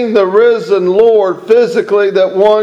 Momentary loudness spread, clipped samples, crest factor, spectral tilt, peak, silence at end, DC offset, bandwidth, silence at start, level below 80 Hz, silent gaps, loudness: 3 LU; 0.3%; 10 dB; -6 dB/octave; 0 dBFS; 0 s; under 0.1%; 8.4 kHz; 0 s; -54 dBFS; none; -10 LUFS